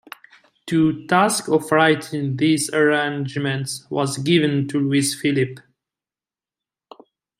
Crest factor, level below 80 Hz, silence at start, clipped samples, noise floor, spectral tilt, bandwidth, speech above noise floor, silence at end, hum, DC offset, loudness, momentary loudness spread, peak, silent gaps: 20 dB; -62 dBFS; 0.65 s; under 0.1%; under -90 dBFS; -5 dB/octave; 15.5 kHz; over 71 dB; 1.8 s; none; under 0.1%; -20 LUFS; 7 LU; -2 dBFS; none